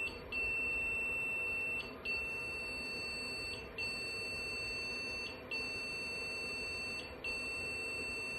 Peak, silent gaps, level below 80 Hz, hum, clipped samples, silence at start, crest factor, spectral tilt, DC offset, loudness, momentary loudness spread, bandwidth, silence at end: -28 dBFS; none; -60 dBFS; none; under 0.1%; 0 s; 12 dB; -2.5 dB/octave; under 0.1%; -38 LUFS; 6 LU; 16 kHz; 0 s